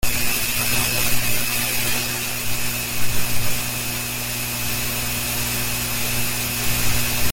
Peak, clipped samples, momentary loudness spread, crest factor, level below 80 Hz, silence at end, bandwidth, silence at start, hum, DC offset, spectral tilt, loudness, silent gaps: -6 dBFS; under 0.1%; 4 LU; 14 dB; -36 dBFS; 0 s; 17 kHz; 0 s; 60 Hz at -35 dBFS; under 0.1%; -2 dB/octave; -21 LUFS; none